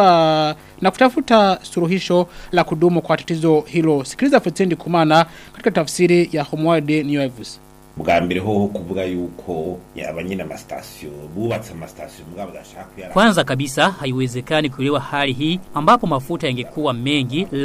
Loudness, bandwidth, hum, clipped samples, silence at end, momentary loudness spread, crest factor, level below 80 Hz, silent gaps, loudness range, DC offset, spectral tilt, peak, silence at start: -18 LUFS; 15.5 kHz; none; under 0.1%; 0 s; 17 LU; 18 dB; -48 dBFS; none; 10 LU; under 0.1%; -5.5 dB/octave; 0 dBFS; 0 s